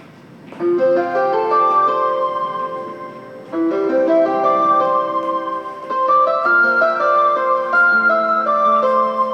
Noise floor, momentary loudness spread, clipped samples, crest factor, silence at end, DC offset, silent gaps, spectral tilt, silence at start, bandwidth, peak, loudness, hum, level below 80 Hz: -40 dBFS; 11 LU; under 0.1%; 12 dB; 0 s; under 0.1%; none; -6 dB/octave; 0 s; 8.6 kHz; -4 dBFS; -16 LUFS; none; -76 dBFS